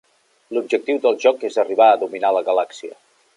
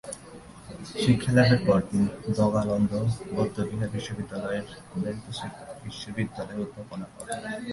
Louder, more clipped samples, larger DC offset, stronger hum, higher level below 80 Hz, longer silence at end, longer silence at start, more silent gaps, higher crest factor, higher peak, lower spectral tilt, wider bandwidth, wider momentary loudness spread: first, -18 LUFS vs -27 LUFS; neither; neither; neither; second, -80 dBFS vs -52 dBFS; first, 0.45 s vs 0 s; first, 0.5 s vs 0.05 s; neither; about the same, 16 dB vs 20 dB; first, -2 dBFS vs -8 dBFS; second, -3.5 dB/octave vs -6.5 dB/octave; about the same, 11 kHz vs 11.5 kHz; second, 13 LU vs 18 LU